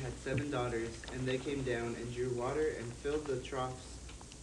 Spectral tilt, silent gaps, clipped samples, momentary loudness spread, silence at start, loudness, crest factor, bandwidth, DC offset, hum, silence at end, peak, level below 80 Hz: -5.5 dB/octave; none; under 0.1%; 6 LU; 0 s; -38 LUFS; 16 dB; 12 kHz; under 0.1%; none; 0 s; -22 dBFS; -52 dBFS